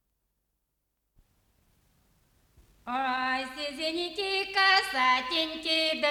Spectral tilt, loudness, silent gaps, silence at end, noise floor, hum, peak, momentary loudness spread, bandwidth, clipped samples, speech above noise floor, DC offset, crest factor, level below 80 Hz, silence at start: -1 dB/octave; -27 LUFS; none; 0 s; -80 dBFS; none; -10 dBFS; 10 LU; 19.5 kHz; under 0.1%; 52 dB; under 0.1%; 22 dB; -66 dBFS; 2.85 s